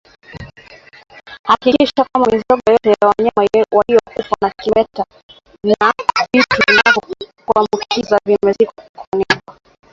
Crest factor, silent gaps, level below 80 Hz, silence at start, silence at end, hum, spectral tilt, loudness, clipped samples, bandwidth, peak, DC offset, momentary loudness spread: 16 dB; 1.39-1.44 s, 5.23-5.29 s, 8.89-8.94 s, 9.07-9.12 s; -48 dBFS; 0.35 s; 0.4 s; none; -4.5 dB/octave; -14 LUFS; under 0.1%; 7.6 kHz; 0 dBFS; under 0.1%; 11 LU